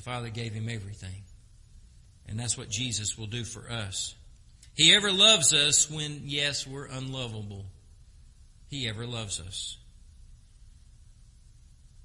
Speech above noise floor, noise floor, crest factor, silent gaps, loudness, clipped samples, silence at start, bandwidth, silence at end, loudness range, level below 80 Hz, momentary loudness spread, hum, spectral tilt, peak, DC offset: 26 dB; -54 dBFS; 26 dB; none; -25 LUFS; under 0.1%; 0 s; 11.5 kHz; 0.15 s; 16 LU; -54 dBFS; 22 LU; none; -1.5 dB/octave; -6 dBFS; under 0.1%